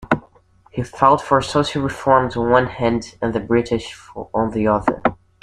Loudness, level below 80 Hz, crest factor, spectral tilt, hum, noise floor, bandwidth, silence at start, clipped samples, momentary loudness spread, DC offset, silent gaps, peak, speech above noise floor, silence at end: -19 LUFS; -44 dBFS; 18 dB; -6 dB/octave; none; -52 dBFS; 12 kHz; 0 s; under 0.1%; 11 LU; under 0.1%; none; 0 dBFS; 34 dB; 0.3 s